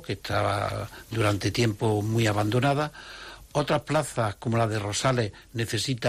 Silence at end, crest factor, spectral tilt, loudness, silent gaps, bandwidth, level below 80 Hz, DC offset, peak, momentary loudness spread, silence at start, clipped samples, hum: 0 s; 14 dB; -5 dB/octave; -27 LUFS; none; 14.5 kHz; -52 dBFS; under 0.1%; -14 dBFS; 9 LU; 0 s; under 0.1%; none